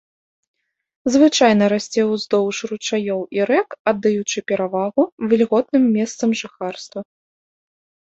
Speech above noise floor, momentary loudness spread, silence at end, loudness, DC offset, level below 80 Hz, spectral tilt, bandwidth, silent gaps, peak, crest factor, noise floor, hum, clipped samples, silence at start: over 72 dB; 12 LU; 1.05 s; -18 LUFS; under 0.1%; -64 dBFS; -4.5 dB/octave; 8 kHz; 3.79-3.85 s, 5.12-5.18 s; -2 dBFS; 16 dB; under -90 dBFS; none; under 0.1%; 1.05 s